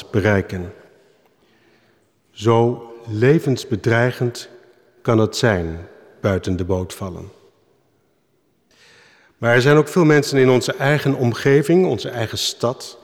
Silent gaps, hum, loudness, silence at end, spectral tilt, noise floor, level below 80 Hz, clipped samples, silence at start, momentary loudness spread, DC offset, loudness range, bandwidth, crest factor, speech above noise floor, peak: none; none; -18 LUFS; 0.1 s; -6 dB/octave; -64 dBFS; -50 dBFS; under 0.1%; 0 s; 15 LU; under 0.1%; 10 LU; 17 kHz; 16 dB; 46 dB; -2 dBFS